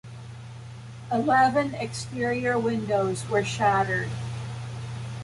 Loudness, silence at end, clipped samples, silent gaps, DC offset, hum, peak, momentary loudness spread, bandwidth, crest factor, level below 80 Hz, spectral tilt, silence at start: -26 LUFS; 0 s; under 0.1%; none; under 0.1%; none; -8 dBFS; 20 LU; 11.5 kHz; 18 dB; -54 dBFS; -5.5 dB/octave; 0.05 s